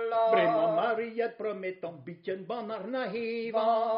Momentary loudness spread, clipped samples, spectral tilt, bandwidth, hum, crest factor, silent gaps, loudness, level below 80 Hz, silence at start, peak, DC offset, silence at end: 13 LU; under 0.1%; -3.5 dB/octave; 5.2 kHz; none; 18 dB; none; -30 LUFS; -80 dBFS; 0 s; -12 dBFS; under 0.1%; 0 s